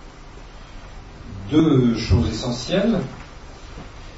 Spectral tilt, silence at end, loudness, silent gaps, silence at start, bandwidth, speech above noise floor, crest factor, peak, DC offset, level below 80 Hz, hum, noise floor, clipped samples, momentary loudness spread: -6.5 dB/octave; 0 s; -20 LUFS; none; 0 s; 8 kHz; 21 dB; 18 dB; -4 dBFS; under 0.1%; -36 dBFS; none; -40 dBFS; under 0.1%; 25 LU